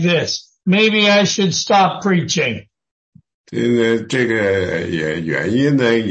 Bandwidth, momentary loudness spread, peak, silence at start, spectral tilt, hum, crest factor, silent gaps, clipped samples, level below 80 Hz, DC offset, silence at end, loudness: 8.8 kHz; 9 LU; -2 dBFS; 0 s; -4.5 dB/octave; none; 14 dB; 2.91-3.12 s, 3.34-3.44 s; under 0.1%; -54 dBFS; under 0.1%; 0 s; -16 LUFS